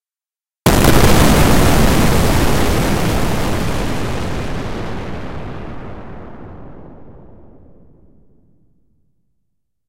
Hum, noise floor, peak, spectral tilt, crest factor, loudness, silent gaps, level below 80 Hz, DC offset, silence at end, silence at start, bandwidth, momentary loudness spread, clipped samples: none; under -90 dBFS; 0 dBFS; -5 dB/octave; 16 dB; -15 LUFS; none; -24 dBFS; 4%; 0 s; 0 s; 16 kHz; 22 LU; under 0.1%